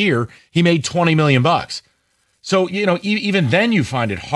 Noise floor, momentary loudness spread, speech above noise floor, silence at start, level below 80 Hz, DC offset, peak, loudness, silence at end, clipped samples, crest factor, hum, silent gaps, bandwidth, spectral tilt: -64 dBFS; 8 LU; 48 dB; 0 s; -52 dBFS; under 0.1%; -2 dBFS; -17 LUFS; 0 s; under 0.1%; 14 dB; none; none; 11.5 kHz; -5.5 dB/octave